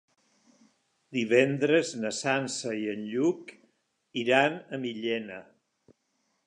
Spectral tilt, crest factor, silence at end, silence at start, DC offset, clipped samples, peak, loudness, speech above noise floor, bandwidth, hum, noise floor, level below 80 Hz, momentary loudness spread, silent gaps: -4.5 dB/octave; 22 dB; 1.05 s; 1.1 s; under 0.1%; under 0.1%; -8 dBFS; -28 LUFS; 48 dB; 10.5 kHz; none; -76 dBFS; -80 dBFS; 14 LU; none